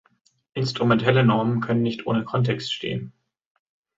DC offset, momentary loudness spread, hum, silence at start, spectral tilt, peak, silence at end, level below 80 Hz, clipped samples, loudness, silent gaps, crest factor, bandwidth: under 0.1%; 12 LU; none; 0.55 s; -7 dB/octave; -6 dBFS; 0.9 s; -58 dBFS; under 0.1%; -23 LUFS; none; 18 dB; 7.8 kHz